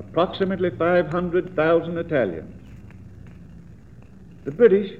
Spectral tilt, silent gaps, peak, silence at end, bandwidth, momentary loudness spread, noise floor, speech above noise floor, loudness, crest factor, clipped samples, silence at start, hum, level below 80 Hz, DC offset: -8.5 dB/octave; none; -4 dBFS; 0 s; 4.7 kHz; 25 LU; -45 dBFS; 25 dB; -21 LUFS; 20 dB; under 0.1%; 0 s; none; -50 dBFS; 0.3%